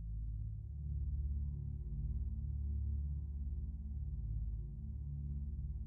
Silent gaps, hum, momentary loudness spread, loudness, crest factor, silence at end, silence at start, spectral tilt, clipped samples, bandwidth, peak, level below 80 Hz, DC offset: none; none; 4 LU; -44 LUFS; 10 dB; 0 s; 0 s; -17 dB/octave; under 0.1%; 1 kHz; -32 dBFS; -42 dBFS; under 0.1%